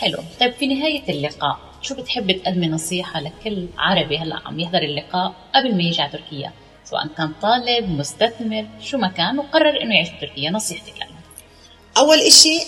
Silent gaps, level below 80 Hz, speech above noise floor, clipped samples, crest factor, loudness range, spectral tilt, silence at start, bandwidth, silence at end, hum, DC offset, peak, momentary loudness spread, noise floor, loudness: none; -50 dBFS; 28 dB; under 0.1%; 20 dB; 3 LU; -2.5 dB/octave; 0 s; 15.5 kHz; 0 s; none; under 0.1%; 0 dBFS; 11 LU; -47 dBFS; -18 LUFS